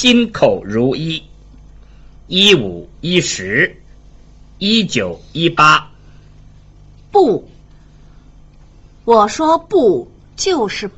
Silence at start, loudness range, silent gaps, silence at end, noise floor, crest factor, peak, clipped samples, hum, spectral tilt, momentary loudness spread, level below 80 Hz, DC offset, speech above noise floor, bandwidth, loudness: 0 s; 3 LU; none; 0.1 s; -42 dBFS; 16 dB; 0 dBFS; under 0.1%; 50 Hz at -45 dBFS; -4 dB/octave; 12 LU; -42 dBFS; under 0.1%; 28 dB; 8.2 kHz; -14 LUFS